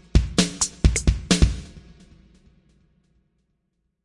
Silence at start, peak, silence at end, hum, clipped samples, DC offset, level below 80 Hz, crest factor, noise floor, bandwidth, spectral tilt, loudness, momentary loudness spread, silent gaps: 0.15 s; -2 dBFS; 2.25 s; none; under 0.1%; under 0.1%; -28 dBFS; 22 dB; -74 dBFS; 11.5 kHz; -4 dB/octave; -21 LUFS; 9 LU; none